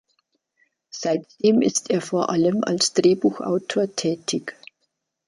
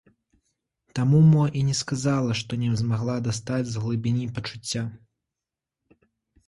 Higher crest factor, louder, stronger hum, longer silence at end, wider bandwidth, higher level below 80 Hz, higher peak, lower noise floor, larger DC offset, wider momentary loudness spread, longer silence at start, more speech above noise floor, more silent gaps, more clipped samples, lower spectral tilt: about the same, 18 dB vs 16 dB; about the same, -22 LUFS vs -24 LUFS; neither; second, 0.75 s vs 1.5 s; about the same, 11.5 kHz vs 11.5 kHz; second, -68 dBFS vs -56 dBFS; first, -4 dBFS vs -10 dBFS; second, -75 dBFS vs -88 dBFS; neither; about the same, 10 LU vs 12 LU; about the same, 0.95 s vs 0.95 s; second, 54 dB vs 65 dB; neither; neither; second, -4.5 dB/octave vs -6 dB/octave